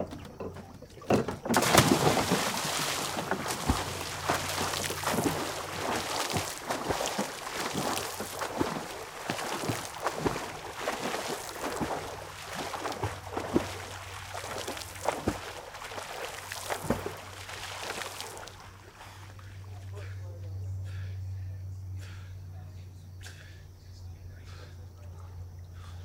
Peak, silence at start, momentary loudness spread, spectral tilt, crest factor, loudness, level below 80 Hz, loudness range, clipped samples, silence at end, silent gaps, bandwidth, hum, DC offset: -4 dBFS; 0 s; 17 LU; -3.5 dB/octave; 30 dB; -32 LUFS; -54 dBFS; 14 LU; under 0.1%; 0 s; none; 18 kHz; none; under 0.1%